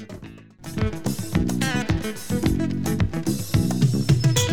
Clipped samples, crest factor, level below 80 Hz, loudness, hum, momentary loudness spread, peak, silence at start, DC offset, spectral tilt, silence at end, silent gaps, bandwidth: under 0.1%; 18 dB; -36 dBFS; -23 LUFS; none; 14 LU; -6 dBFS; 0 s; 1%; -5.5 dB/octave; 0 s; none; 19.5 kHz